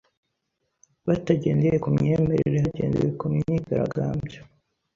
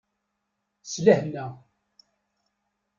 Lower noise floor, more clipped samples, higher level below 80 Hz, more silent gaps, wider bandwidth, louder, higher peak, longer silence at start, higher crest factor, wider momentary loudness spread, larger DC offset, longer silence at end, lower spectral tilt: about the same, -77 dBFS vs -79 dBFS; neither; first, -48 dBFS vs -68 dBFS; neither; about the same, 7.2 kHz vs 7.4 kHz; about the same, -24 LUFS vs -24 LUFS; second, -8 dBFS vs -4 dBFS; first, 1.05 s vs 0.85 s; second, 18 dB vs 24 dB; second, 7 LU vs 19 LU; neither; second, 0.5 s vs 1.4 s; first, -9 dB/octave vs -5.5 dB/octave